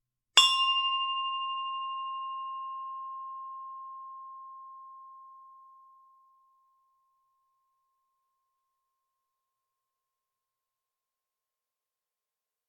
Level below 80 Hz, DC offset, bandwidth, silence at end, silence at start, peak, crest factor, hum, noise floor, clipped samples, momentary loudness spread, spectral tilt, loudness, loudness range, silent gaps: -82 dBFS; under 0.1%; 6.8 kHz; 6.95 s; 0.35 s; -4 dBFS; 32 dB; none; under -90 dBFS; under 0.1%; 26 LU; 8 dB/octave; -28 LUFS; 25 LU; none